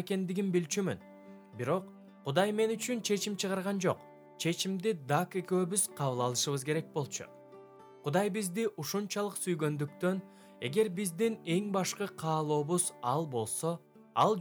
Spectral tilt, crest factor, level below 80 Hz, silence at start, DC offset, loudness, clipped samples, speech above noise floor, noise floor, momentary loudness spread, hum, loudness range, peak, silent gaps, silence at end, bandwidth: -4.5 dB/octave; 20 dB; -80 dBFS; 0 s; under 0.1%; -33 LUFS; under 0.1%; 21 dB; -54 dBFS; 9 LU; none; 2 LU; -14 dBFS; none; 0 s; over 20 kHz